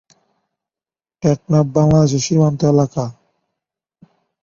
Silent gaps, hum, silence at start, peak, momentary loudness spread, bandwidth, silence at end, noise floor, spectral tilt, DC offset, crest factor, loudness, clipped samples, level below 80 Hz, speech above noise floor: none; none; 1.25 s; 0 dBFS; 8 LU; 7.6 kHz; 1.3 s; under -90 dBFS; -7 dB/octave; under 0.1%; 16 dB; -15 LUFS; under 0.1%; -46 dBFS; over 76 dB